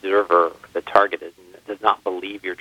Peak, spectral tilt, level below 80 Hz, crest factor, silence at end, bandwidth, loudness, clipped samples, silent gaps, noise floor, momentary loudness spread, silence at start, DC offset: 0 dBFS; -4.5 dB/octave; -64 dBFS; 20 dB; 0.05 s; 14.5 kHz; -20 LUFS; under 0.1%; none; -40 dBFS; 14 LU; 0.05 s; under 0.1%